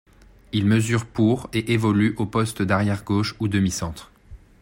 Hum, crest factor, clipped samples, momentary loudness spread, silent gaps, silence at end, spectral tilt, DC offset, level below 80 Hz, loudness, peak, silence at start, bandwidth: none; 16 dB; under 0.1%; 6 LU; none; 0.25 s; -6 dB/octave; under 0.1%; -48 dBFS; -22 LUFS; -8 dBFS; 0.55 s; 16.5 kHz